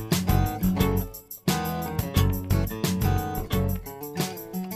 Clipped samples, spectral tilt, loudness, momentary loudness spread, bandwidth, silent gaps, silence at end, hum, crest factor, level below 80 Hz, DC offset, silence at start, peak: under 0.1%; -5.5 dB/octave; -27 LUFS; 7 LU; 16 kHz; none; 0 s; none; 18 dB; -34 dBFS; under 0.1%; 0 s; -8 dBFS